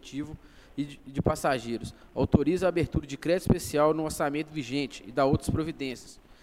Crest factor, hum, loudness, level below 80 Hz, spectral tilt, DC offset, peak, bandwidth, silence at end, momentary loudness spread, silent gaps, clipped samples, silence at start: 24 dB; none; -29 LUFS; -46 dBFS; -6 dB/octave; under 0.1%; -6 dBFS; 16 kHz; 0.1 s; 13 LU; none; under 0.1%; 0.05 s